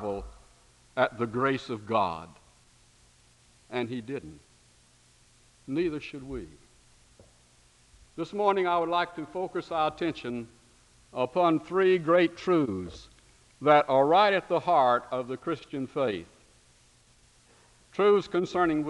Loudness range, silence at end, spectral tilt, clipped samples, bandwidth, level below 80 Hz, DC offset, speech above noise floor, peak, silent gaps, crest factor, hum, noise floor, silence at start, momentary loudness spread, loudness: 14 LU; 0 s; -6.5 dB/octave; under 0.1%; 11.5 kHz; -60 dBFS; under 0.1%; 34 dB; -6 dBFS; none; 22 dB; 60 Hz at -60 dBFS; -61 dBFS; 0 s; 17 LU; -27 LUFS